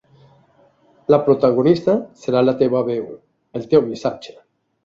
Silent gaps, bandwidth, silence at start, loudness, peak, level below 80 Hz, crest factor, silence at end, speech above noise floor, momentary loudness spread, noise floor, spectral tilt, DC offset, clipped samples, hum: none; 7.6 kHz; 1.1 s; -18 LUFS; -2 dBFS; -58 dBFS; 18 dB; 0.55 s; 38 dB; 17 LU; -55 dBFS; -8 dB/octave; under 0.1%; under 0.1%; none